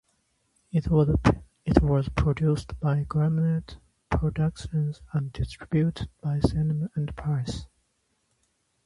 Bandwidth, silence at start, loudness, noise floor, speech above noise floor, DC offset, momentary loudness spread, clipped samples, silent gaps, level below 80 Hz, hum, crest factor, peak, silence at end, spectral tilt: 11 kHz; 0.75 s; -27 LUFS; -73 dBFS; 48 dB; under 0.1%; 9 LU; under 0.1%; none; -38 dBFS; none; 24 dB; -2 dBFS; 1.2 s; -8 dB/octave